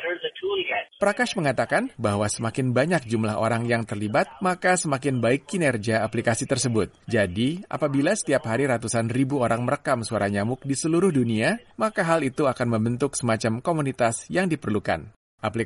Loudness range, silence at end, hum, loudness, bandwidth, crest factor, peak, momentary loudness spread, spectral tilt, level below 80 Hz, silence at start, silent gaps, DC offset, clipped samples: 1 LU; 0 s; none; -24 LUFS; 11.5 kHz; 16 dB; -8 dBFS; 4 LU; -5 dB/octave; -56 dBFS; 0 s; 15.16-15.38 s; under 0.1%; under 0.1%